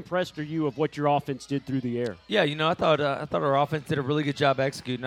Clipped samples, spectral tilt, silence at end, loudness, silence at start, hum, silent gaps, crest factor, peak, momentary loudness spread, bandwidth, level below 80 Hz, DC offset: under 0.1%; -6 dB/octave; 0 s; -26 LUFS; 0 s; none; none; 18 dB; -8 dBFS; 7 LU; 14.5 kHz; -62 dBFS; under 0.1%